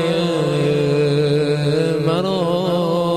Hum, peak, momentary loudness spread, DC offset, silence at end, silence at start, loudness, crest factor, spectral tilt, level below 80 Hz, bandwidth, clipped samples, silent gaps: none; -6 dBFS; 2 LU; under 0.1%; 0 s; 0 s; -18 LUFS; 12 dB; -7 dB/octave; -50 dBFS; 13 kHz; under 0.1%; none